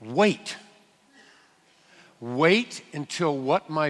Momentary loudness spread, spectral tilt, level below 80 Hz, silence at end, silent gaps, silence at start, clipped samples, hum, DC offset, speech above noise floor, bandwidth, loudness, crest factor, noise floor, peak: 16 LU; -5 dB/octave; -74 dBFS; 0 s; none; 0 s; under 0.1%; none; under 0.1%; 36 dB; 12 kHz; -25 LUFS; 20 dB; -60 dBFS; -6 dBFS